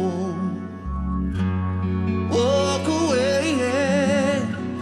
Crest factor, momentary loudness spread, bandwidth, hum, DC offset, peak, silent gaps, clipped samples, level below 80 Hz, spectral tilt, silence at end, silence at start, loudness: 12 dB; 8 LU; 12 kHz; none; under 0.1%; -8 dBFS; none; under 0.1%; -38 dBFS; -5.5 dB/octave; 0 s; 0 s; -22 LUFS